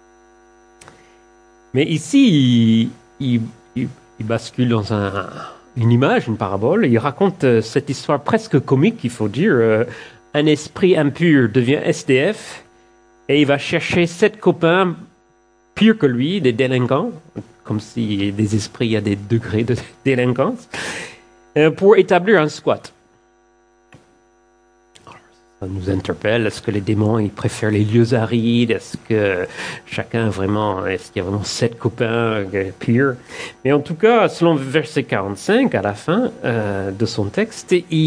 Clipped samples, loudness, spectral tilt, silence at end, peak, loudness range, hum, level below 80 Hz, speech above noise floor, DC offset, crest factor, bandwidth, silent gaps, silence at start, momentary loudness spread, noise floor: under 0.1%; -18 LUFS; -6.5 dB/octave; 0 s; 0 dBFS; 4 LU; none; -54 dBFS; 39 dB; under 0.1%; 18 dB; 10.5 kHz; none; 1.75 s; 12 LU; -56 dBFS